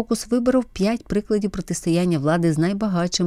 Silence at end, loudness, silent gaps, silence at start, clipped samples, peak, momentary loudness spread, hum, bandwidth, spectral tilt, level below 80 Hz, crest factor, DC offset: 0 s; -21 LUFS; none; 0 s; under 0.1%; -8 dBFS; 4 LU; none; 14.5 kHz; -6 dB/octave; -44 dBFS; 14 dB; under 0.1%